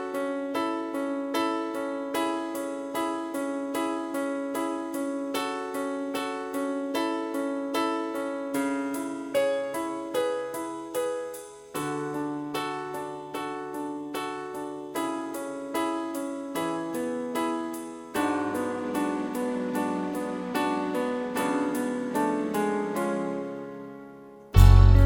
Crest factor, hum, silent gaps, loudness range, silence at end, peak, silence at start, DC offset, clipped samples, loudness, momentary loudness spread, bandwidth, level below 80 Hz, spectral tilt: 24 dB; none; none; 5 LU; 0 s; -4 dBFS; 0 s; under 0.1%; under 0.1%; -29 LUFS; 7 LU; 17.5 kHz; -34 dBFS; -6.5 dB/octave